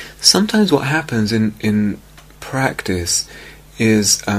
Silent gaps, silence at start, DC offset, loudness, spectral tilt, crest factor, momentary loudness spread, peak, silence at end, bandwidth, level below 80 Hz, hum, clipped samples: none; 0 s; under 0.1%; -16 LUFS; -3.5 dB/octave; 18 dB; 12 LU; 0 dBFS; 0 s; 15.5 kHz; -44 dBFS; none; under 0.1%